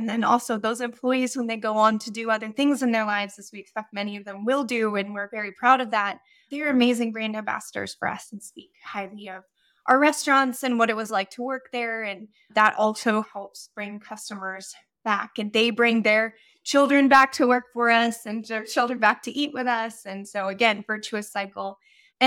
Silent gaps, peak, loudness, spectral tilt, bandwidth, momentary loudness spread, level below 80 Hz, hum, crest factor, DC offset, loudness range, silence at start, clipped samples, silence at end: none; -4 dBFS; -23 LUFS; -3.5 dB/octave; 17 kHz; 16 LU; -72 dBFS; none; 20 dB; under 0.1%; 6 LU; 0 s; under 0.1%; 0 s